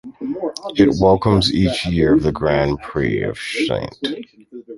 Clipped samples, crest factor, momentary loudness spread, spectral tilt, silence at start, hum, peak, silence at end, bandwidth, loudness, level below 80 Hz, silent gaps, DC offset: under 0.1%; 16 dB; 12 LU; -6.5 dB/octave; 0.05 s; none; -2 dBFS; 0 s; 11.5 kHz; -18 LUFS; -36 dBFS; none; under 0.1%